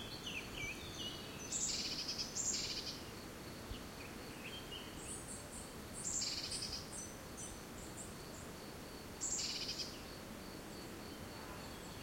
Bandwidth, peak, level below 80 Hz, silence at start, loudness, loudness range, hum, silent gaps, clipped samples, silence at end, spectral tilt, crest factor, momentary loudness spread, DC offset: 16.5 kHz; -26 dBFS; -60 dBFS; 0 s; -44 LUFS; 4 LU; none; none; under 0.1%; 0 s; -2 dB/octave; 20 dB; 12 LU; under 0.1%